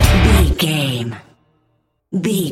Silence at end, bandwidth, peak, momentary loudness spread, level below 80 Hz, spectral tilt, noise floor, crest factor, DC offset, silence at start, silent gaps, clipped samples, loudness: 0 s; 16.5 kHz; 0 dBFS; 15 LU; -20 dBFS; -5 dB/octave; -64 dBFS; 16 dB; under 0.1%; 0 s; none; under 0.1%; -16 LUFS